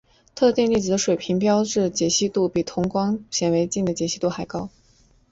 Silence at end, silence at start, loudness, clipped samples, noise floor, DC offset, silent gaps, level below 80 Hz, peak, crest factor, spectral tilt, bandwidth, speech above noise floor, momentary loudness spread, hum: 0.65 s; 0.35 s; -22 LUFS; under 0.1%; -57 dBFS; under 0.1%; none; -54 dBFS; -8 dBFS; 16 dB; -4.5 dB/octave; 8 kHz; 36 dB; 8 LU; none